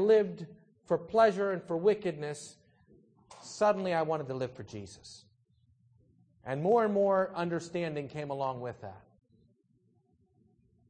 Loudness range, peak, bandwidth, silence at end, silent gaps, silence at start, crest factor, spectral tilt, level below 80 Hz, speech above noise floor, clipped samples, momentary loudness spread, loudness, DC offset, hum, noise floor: 5 LU; -12 dBFS; 9.8 kHz; 1.9 s; none; 0 s; 20 dB; -6 dB/octave; -72 dBFS; 40 dB; under 0.1%; 21 LU; -31 LUFS; under 0.1%; none; -71 dBFS